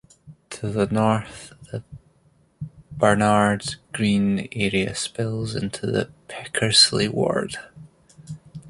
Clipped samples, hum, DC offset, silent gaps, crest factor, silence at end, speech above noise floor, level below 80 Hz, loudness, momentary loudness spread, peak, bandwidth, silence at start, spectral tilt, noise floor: under 0.1%; none; under 0.1%; none; 22 dB; 0 s; 38 dB; -52 dBFS; -21 LUFS; 22 LU; -2 dBFS; 11.5 kHz; 0.25 s; -4 dB/octave; -60 dBFS